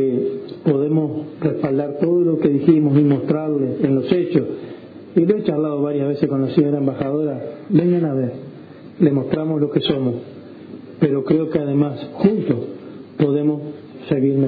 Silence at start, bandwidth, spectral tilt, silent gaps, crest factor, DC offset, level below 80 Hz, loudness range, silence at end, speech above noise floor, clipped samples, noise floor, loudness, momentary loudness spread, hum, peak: 0 s; 4.9 kHz; -11.5 dB/octave; none; 18 dB; under 0.1%; -56 dBFS; 3 LU; 0 s; 21 dB; under 0.1%; -38 dBFS; -19 LUFS; 17 LU; none; -2 dBFS